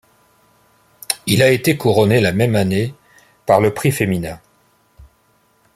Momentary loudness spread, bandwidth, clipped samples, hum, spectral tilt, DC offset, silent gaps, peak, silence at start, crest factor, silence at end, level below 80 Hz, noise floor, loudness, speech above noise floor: 12 LU; 16 kHz; under 0.1%; none; -5.5 dB/octave; under 0.1%; none; 0 dBFS; 1.1 s; 18 dB; 1.4 s; -50 dBFS; -58 dBFS; -16 LUFS; 43 dB